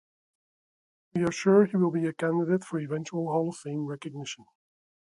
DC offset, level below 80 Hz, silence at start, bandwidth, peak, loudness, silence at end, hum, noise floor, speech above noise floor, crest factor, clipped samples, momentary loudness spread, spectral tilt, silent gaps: under 0.1%; -70 dBFS; 1.15 s; 11.5 kHz; -10 dBFS; -28 LUFS; 0.7 s; none; under -90 dBFS; over 63 dB; 20 dB; under 0.1%; 15 LU; -6.5 dB/octave; none